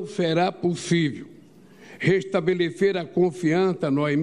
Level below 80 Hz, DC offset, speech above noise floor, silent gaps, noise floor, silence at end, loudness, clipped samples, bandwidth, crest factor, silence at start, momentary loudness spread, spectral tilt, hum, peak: -64 dBFS; 0.1%; 27 dB; none; -49 dBFS; 0 s; -23 LUFS; under 0.1%; 11.5 kHz; 16 dB; 0 s; 4 LU; -6.5 dB/octave; none; -8 dBFS